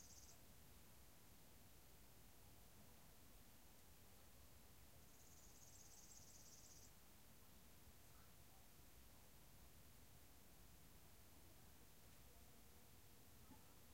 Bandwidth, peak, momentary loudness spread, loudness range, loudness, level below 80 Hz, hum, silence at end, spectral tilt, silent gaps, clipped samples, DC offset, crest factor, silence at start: 16 kHz; -50 dBFS; 4 LU; 2 LU; -67 LUFS; -74 dBFS; none; 0 s; -3 dB/octave; none; under 0.1%; under 0.1%; 16 dB; 0 s